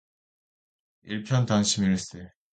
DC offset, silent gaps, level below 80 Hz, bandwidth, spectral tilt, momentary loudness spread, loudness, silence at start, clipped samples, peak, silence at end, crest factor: under 0.1%; none; -56 dBFS; 9.4 kHz; -4.5 dB/octave; 16 LU; -26 LUFS; 1.05 s; under 0.1%; -10 dBFS; 0.25 s; 18 dB